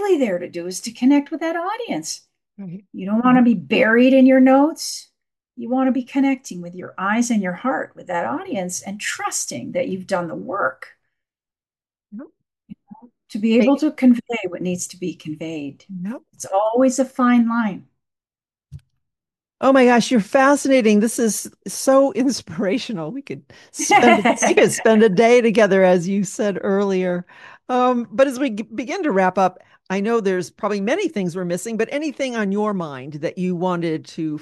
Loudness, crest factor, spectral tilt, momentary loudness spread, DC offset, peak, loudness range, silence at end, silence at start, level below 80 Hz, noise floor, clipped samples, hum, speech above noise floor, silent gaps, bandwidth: -19 LUFS; 18 dB; -5 dB/octave; 16 LU; under 0.1%; 0 dBFS; 8 LU; 0 s; 0 s; -66 dBFS; under -90 dBFS; under 0.1%; none; over 72 dB; none; 12.5 kHz